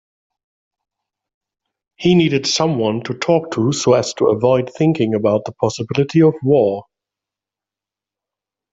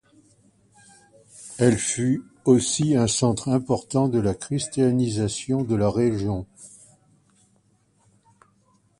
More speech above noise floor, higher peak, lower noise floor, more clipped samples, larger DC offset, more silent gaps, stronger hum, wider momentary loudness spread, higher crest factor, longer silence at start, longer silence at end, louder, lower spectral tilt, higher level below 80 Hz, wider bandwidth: first, 72 dB vs 42 dB; about the same, -2 dBFS vs -4 dBFS; first, -88 dBFS vs -63 dBFS; neither; neither; neither; neither; second, 7 LU vs 10 LU; about the same, 16 dB vs 20 dB; first, 2 s vs 1.4 s; second, 1.9 s vs 2.3 s; first, -16 LUFS vs -23 LUFS; about the same, -5.5 dB/octave vs -5.5 dB/octave; second, -56 dBFS vs -50 dBFS; second, 8 kHz vs 11.5 kHz